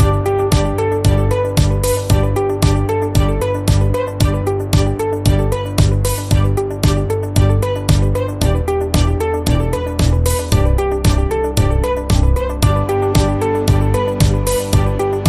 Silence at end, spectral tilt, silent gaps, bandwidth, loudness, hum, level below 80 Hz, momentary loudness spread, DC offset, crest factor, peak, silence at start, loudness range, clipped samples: 0 s; -6 dB/octave; none; 15.5 kHz; -16 LUFS; none; -20 dBFS; 3 LU; under 0.1%; 14 dB; 0 dBFS; 0 s; 1 LU; under 0.1%